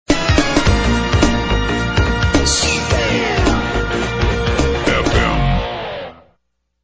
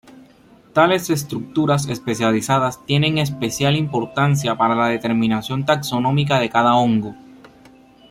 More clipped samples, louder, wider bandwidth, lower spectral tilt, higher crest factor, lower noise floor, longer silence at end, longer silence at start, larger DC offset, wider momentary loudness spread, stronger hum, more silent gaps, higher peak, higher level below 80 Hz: neither; about the same, -16 LUFS vs -18 LUFS; second, 8 kHz vs 15.5 kHz; about the same, -4.5 dB/octave vs -5.5 dB/octave; about the same, 16 dB vs 16 dB; first, -67 dBFS vs -49 dBFS; second, 0.7 s vs 0.95 s; second, 0.1 s vs 0.75 s; neither; about the same, 5 LU vs 6 LU; neither; neither; about the same, 0 dBFS vs -2 dBFS; first, -22 dBFS vs -54 dBFS